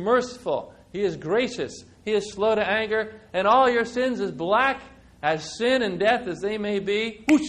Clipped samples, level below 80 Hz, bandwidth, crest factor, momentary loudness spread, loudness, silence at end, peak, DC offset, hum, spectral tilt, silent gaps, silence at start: under 0.1%; -56 dBFS; 12 kHz; 16 dB; 9 LU; -24 LUFS; 0 s; -8 dBFS; under 0.1%; none; -4.5 dB/octave; none; 0 s